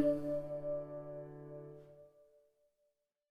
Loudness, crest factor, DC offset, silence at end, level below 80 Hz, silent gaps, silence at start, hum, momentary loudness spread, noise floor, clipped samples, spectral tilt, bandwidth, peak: -42 LUFS; 22 dB; under 0.1%; 1.05 s; -68 dBFS; none; 0 s; none; 19 LU; -83 dBFS; under 0.1%; -9.5 dB/octave; 10.5 kHz; -20 dBFS